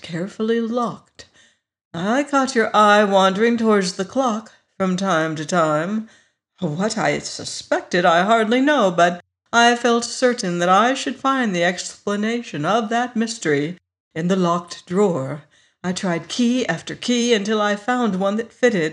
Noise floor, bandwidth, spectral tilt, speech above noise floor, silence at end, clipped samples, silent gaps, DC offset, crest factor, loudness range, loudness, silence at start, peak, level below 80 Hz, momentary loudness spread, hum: -57 dBFS; 11 kHz; -4.5 dB/octave; 38 dB; 0 s; under 0.1%; 1.85-1.91 s, 14.00-14.11 s; under 0.1%; 16 dB; 5 LU; -19 LUFS; 0.05 s; -2 dBFS; -66 dBFS; 11 LU; none